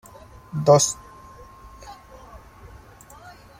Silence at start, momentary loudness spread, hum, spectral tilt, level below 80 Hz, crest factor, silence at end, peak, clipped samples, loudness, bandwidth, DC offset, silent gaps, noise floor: 0.55 s; 29 LU; none; -4.5 dB/octave; -52 dBFS; 24 dB; 1.2 s; -2 dBFS; under 0.1%; -19 LUFS; 16 kHz; under 0.1%; none; -46 dBFS